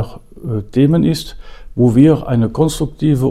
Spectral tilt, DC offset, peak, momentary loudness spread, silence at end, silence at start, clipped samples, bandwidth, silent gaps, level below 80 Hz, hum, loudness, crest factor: -7.5 dB/octave; under 0.1%; 0 dBFS; 17 LU; 0 s; 0 s; under 0.1%; 15 kHz; none; -34 dBFS; none; -14 LUFS; 14 dB